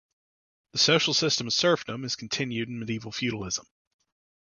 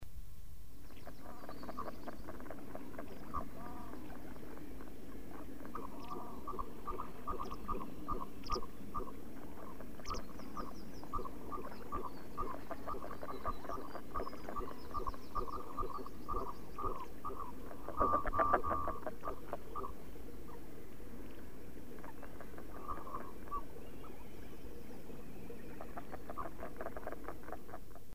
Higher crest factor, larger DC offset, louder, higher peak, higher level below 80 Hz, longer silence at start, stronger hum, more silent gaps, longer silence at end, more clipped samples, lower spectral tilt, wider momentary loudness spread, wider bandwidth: second, 22 dB vs 28 dB; second, under 0.1% vs 1%; first, -26 LUFS vs -45 LUFS; first, -6 dBFS vs -16 dBFS; second, -62 dBFS vs -52 dBFS; first, 0.75 s vs 0 s; neither; neither; first, 0.85 s vs 0 s; neither; second, -3 dB/octave vs -6 dB/octave; about the same, 11 LU vs 10 LU; second, 10 kHz vs 15.5 kHz